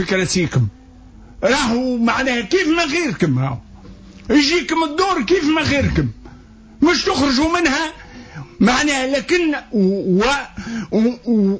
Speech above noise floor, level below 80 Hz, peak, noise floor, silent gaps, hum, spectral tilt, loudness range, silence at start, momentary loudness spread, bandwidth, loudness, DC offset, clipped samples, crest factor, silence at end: 25 dB; -38 dBFS; -4 dBFS; -42 dBFS; none; none; -5 dB/octave; 1 LU; 0 s; 9 LU; 8 kHz; -17 LUFS; under 0.1%; under 0.1%; 14 dB; 0 s